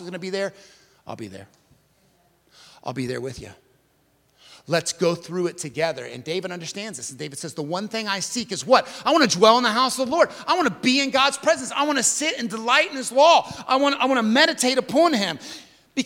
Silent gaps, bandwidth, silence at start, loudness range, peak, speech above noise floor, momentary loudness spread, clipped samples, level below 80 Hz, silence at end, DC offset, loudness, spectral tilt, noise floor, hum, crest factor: none; 17 kHz; 0 s; 16 LU; -2 dBFS; 42 dB; 16 LU; under 0.1%; -64 dBFS; 0 s; under 0.1%; -21 LUFS; -3 dB/octave; -63 dBFS; none; 22 dB